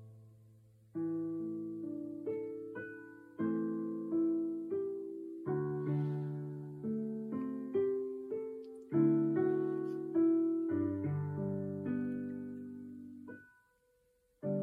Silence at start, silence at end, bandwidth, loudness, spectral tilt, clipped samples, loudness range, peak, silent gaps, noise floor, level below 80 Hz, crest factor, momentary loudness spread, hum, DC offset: 0 s; 0 s; 3.3 kHz; -37 LUFS; -11 dB/octave; under 0.1%; 8 LU; -20 dBFS; none; -74 dBFS; -78 dBFS; 18 dB; 15 LU; none; under 0.1%